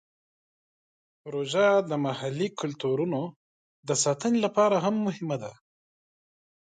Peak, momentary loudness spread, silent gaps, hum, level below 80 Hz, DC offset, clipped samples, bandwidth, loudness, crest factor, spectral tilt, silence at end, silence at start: -10 dBFS; 13 LU; 3.36-3.83 s; none; -74 dBFS; under 0.1%; under 0.1%; 9.6 kHz; -27 LUFS; 18 dB; -4.5 dB/octave; 1.1 s; 1.25 s